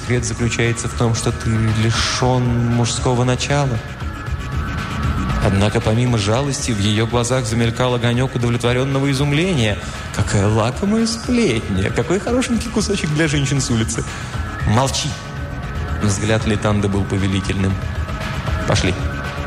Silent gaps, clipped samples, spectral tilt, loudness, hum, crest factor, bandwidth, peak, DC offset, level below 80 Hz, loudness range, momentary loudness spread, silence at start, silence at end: none; under 0.1%; -5 dB/octave; -18 LUFS; none; 14 dB; 13.5 kHz; -4 dBFS; under 0.1%; -30 dBFS; 2 LU; 7 LU; 0 s; 0 s